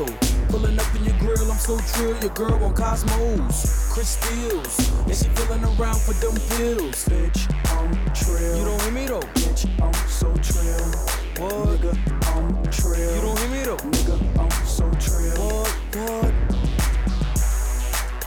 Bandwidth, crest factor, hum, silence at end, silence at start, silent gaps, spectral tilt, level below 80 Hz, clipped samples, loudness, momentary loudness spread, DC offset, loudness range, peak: 18.5 kHz; 10 dB; none; 0 s; 0 s; none; -5 dB/octave; -22 dBFS; under 0.1%; -23 LUFS; 2 LU; under 0.1%; 1 LU; -10 dBFS